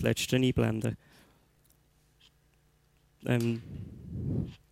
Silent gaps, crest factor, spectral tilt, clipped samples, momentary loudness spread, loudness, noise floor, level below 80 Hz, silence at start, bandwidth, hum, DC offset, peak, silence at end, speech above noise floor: none; 20 dB; -6 dB/octave; under 0.1%; 17 LU; -31 LUFS; -67 dBFS; -54 dBFS; 0 s; 16 kHz; 60 Hz at -55 dBFS; under 0.1%; -12 dBFS; 0.15 s; 37 dB